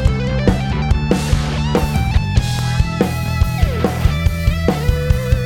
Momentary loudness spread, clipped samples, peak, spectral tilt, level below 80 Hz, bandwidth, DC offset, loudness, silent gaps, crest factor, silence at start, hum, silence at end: 2 LU; under 0.1%; 0 dBFS; -6.5 dB/octave; -20 dBFS; 17.5 kHz; under 0.1%; -17 LUFS; none; 16 dB; 0 s; none; 0 s